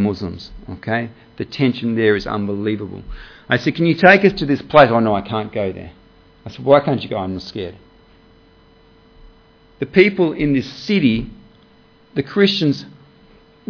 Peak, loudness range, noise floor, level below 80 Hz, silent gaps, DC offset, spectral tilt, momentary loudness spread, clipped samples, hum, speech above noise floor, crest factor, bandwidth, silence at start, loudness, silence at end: 0 dBFS; 7 LU; -50 dBFS; -44 dBFS; none; under 0.1%; -7 dB/octave; 20 LU; under 0.1%; none; 33 dB; 18 dB; 5.4 kHz; 0 s; -17 LUFS; 0.8 s